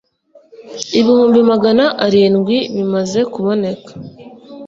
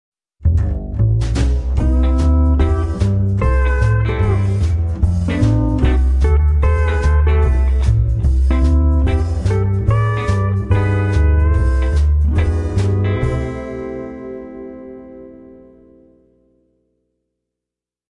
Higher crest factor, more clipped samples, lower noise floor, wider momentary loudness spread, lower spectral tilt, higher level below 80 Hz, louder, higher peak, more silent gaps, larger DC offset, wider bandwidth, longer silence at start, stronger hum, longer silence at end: about the same, 14 dB vs 12 dB; neither; second, -49 dBFS vs -86 dBFS; first, 20 LU vs 11 LU; second, -5.5 dB/octave vs -8 dB/octave; second, -56 dBFS vs -18 dBFS; first, -13 LUFS vs -16 LUFS; about the same, 0 dBFS vs -2 dBFS; neither; neither; second, 7.8 kHz vs 9 kHz; first, 0.6 s vs 0.4 s; second, none vs 60 Hz at -45 dBFS; second, 0 s vs 2.85 s